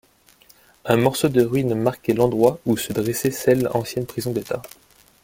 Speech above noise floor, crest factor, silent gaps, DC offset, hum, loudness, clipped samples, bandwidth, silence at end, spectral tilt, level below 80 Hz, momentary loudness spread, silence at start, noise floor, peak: 34 dB; 20 dB; none; under 0.1%; none; -21 LUFS; under 0.1%; 17 kHz; 0.55 s; -6 dB/octave; -54 dBFS; 9 LU; 0.85 s; -54 dBFS; -2 dBFS